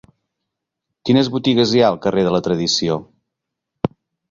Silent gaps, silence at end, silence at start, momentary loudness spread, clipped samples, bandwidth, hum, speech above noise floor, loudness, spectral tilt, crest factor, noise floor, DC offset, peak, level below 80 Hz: none; 0.45 s; 1.05 s; 11 LU; under 0.1%; 7.6 kHz; none; 64 dB; -17 LUFS; -5.5 dB/octave; 18 dB; -80 dBFS; under 0.1%; -2 dBFS; -52 dBFS